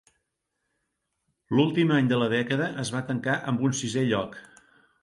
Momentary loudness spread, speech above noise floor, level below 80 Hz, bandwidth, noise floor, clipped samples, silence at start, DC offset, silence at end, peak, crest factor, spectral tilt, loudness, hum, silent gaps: 7 LU; 55 dB; -64 dBFS; 11.5 kHz; -80 dBFS; under 0.1%; 1.5 s; under 0.1%; 0.6 s; -8 dBFS; 18 dB; -5.5 dB/octave; -26 LUFS; none; none